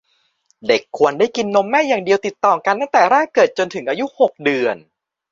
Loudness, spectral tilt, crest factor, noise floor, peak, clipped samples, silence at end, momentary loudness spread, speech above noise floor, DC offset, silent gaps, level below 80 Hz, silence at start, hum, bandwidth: -17 LUFS; -4 dB/octave; 16 dB; -62 dBFS; 0 dBFS; under 0.1%; 0.55 s; 8 LU; 46 dB; under 0.1%; none; -64 dBFS; 0.65 s; none; 7.6 kHz